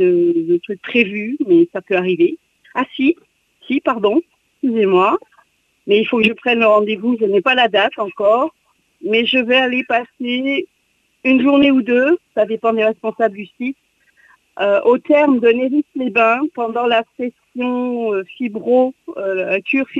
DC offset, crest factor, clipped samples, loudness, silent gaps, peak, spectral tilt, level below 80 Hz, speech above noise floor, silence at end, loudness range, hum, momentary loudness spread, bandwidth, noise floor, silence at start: under 0.1%; 14 dB; under 0.1%; -16 LUFS; none; -2 dBFS; -6.5 dB/octave; -62 dBFS; 47 dB; 0 s; 3 LU; none; 10 LU; 7.2 kHz; -63 dBFS; 0 s